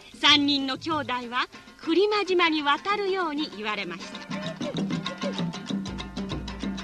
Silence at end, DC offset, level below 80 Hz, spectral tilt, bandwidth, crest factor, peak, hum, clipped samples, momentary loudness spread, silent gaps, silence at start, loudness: 0 s; under 0.1%; -50 dBFS; -4 dB/octave; 12 kHz; 20 dB; -8 dBFS; none; under 0.1%; 14 LU; none; 0 s; -26 LUFS